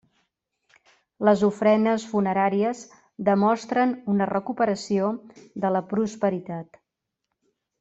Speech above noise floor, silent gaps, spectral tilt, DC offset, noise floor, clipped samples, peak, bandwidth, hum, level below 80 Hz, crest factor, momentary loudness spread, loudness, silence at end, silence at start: 60 dB; none; -6.5 dB/octave; under 0.1%; -83 dBFS; under 0.1%; -4 dBFS; 8 kHz; none; -66 dBFS; 20 dB; 13 LU; -24 LUFS; 1.15 s; 1.2 s